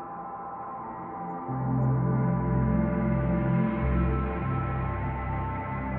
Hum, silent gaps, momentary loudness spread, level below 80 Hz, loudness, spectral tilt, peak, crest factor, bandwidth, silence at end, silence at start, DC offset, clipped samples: none; none; 11 LU; -36 dBFS; -29 LUFS; -12.5 dB/octave; -14 dBFS; 14 dB; 3.5 kHz; 0 s; 0 s; under 0.1%; under 0.1%